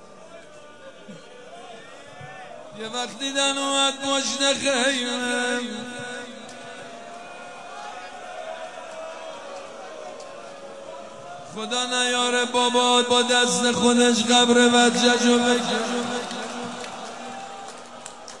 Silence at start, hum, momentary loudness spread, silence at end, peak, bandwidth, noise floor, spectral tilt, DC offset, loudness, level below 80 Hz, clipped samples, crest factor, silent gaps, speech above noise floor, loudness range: 0 s; none; 22 LU; 0 s; -4 dBFS; 11.5 kHz; -45 dBFS; -2 dB/octave; 0.3%; -20 LUFS; -70 dBFS; under 0.1%; 20 dB; none; 24 dB; 19 LU